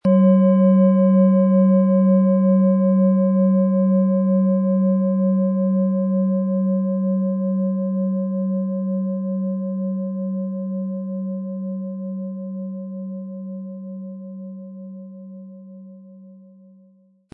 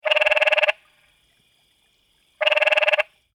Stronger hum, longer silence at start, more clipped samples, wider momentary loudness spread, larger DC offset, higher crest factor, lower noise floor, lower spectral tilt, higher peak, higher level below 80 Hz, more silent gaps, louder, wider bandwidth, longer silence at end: neither; about the same, 0.05 s vs 0.05 s; neither; first, 19 LU vs 7 LU; neither; about the same, 14 dB vs 18 dB; second, -55 dBFS vs -64 dBFS; first, -14 dB/octave vs 1 dB/octave; about the same, -6 dBFS vs -6 dBFS; about the same, -74 dBFS vs -70 dBFS; neither; about the same, -19 LUFS vs -18 LUFS; second, 2.4 kHz vs 13 kHz; first, 0.95 s vs 0.3 s